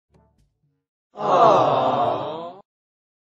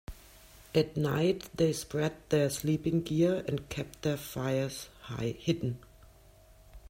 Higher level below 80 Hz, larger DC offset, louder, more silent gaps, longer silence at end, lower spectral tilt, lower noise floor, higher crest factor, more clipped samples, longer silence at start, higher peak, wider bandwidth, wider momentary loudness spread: second, -66 dBFS vs -56 dBFS; neither; first, -19 LUFS vs -32 LUFS; neither; first, 0.85 s vs 0 s; about the same, -6 dB/octave vs -6 dB/octave; first, -66 dBFS vs -58 dBFS; about the same, 20 dB vs 18 dB; neither; first, 1.15 s vs 0.1 s; first, -2 dBFS vs -14 dBFS; second, 7.6 kHz vs 16 kHz; first, 18 LU vs 9 LU